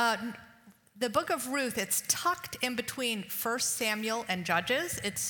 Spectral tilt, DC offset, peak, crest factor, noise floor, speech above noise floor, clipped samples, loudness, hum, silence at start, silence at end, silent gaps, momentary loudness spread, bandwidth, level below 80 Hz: -2 dB/octave; under 0.1%; -12 dBFS; 20 dB; -58 dBFS; 26 dB; under 0.1%; -31 LUFS; none; 0 s; 0 s; none; 4 LU; 19 kHz; -68 dBFS